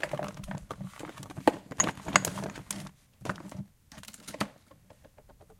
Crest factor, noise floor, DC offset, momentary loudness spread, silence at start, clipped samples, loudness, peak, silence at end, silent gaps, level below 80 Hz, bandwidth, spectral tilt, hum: 34 dB; -58 dBFS; under 0.1%; 19 LU; 0 s; under 0.1%; -33 LUFS; 0 dBFS; 0.05 s; none; -58 dBFS; 17 kHz; -3 dB/octave; none